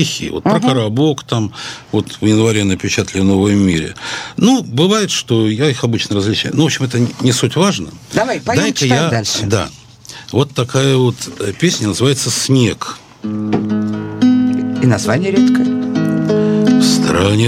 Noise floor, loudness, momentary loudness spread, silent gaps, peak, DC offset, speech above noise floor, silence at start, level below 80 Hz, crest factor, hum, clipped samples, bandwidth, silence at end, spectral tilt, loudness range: -35 dBFS; -14 LUFS; 8 LU; none; 0 dBFS; under 0.1%; 21 dB; 0 s; -46 dBFS; 14 dB; none; under 0.1%; 16 kHz; 0 s; -5 dB/octave; 2 LU